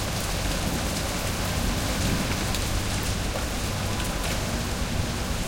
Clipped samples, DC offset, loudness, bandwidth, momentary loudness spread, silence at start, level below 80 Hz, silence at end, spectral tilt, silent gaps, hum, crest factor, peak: under 0.1%; under 0.1%; -27 LUFS; 17 kHz; 3 LU; 0 s; -32 dBFS; 0 s; -4 dB/octave; none; none; 14 dB; -12 dBFS